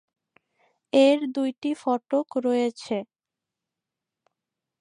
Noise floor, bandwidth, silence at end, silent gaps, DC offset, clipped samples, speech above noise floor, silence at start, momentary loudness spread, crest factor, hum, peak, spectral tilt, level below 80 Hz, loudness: -88 dBFS; 11 kHz; 1.75 s; 1.58-1.62 s; under 0.1%; under 0.1%; 65 dB; 0.95 s; 11 LU; 20 dB; none; -8 dBFS; -4.5 dB/octave; -80 dBFS; -24 LUFS